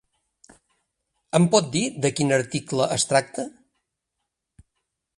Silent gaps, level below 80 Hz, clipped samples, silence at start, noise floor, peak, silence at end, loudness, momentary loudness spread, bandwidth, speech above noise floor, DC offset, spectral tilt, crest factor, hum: none; -62 dBFS; under 0.1%; 1.35 s; -81 dBFS; -4 dBFS; 1.7 s; -22 LUFS; 12 LU; 11.5 kHz; 59 dB; under 0.1%; -4.5 dB/octave; 22 dB; none